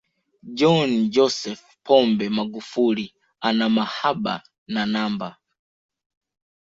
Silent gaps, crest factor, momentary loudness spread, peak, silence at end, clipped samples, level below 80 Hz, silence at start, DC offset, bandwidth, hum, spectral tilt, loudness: 4.58-4.66 s; 20 dB; 15 LU; -4 dBFS; 1.35 s; under 0.1%; -64 dBFS; 0.45 s; under 0.1%; 7.8 kHz; none; -5.5 dB/octave; -22 LUFS